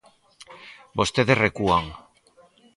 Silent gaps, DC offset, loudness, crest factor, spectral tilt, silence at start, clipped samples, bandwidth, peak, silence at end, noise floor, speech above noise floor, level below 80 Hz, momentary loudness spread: none; under 0.1%; -22 LUFS; 22 dB; -5 dB/octave; 0.4 s; under 0.1%; 11.5 kHz; -4 dBFS; 0.8 s; -57 dBFS; 36 dB; -48 dBFS; 24 LU